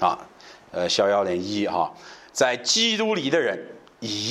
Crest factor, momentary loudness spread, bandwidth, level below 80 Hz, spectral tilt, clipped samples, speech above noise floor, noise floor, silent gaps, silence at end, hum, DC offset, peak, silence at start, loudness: 18 dB; 15 LU; 14 kHz; -66 dBFS; -2.5 dB/octave; under 0.1%; 24 dB; -47 dBFS; none; 0 s; none; under 0.1%; -6 dBFS; 0 s; -23 LUFS